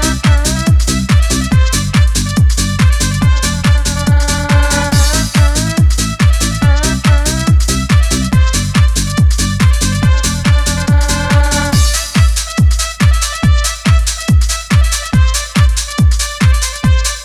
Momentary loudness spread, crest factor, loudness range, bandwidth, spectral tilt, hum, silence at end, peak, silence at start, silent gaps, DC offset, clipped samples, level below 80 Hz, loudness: 1 LU; 10 dB; 1 LU; 14 kHz; -4.5 dB/octave; none; 0 s; 0 dBFS; 0 s; none; under 0.1%; under 0.1%; -14 dBFS; -12 LUFS